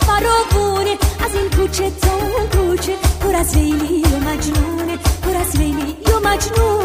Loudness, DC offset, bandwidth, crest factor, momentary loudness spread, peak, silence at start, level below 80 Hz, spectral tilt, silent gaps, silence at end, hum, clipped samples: -17 LUFS; under 0.1%; 16 kHz; 16 dB; 4 LU; 0 dBFS; 0 s; -20 dBFS; -5 dB/octave; none; 0 s; none; under 0.1%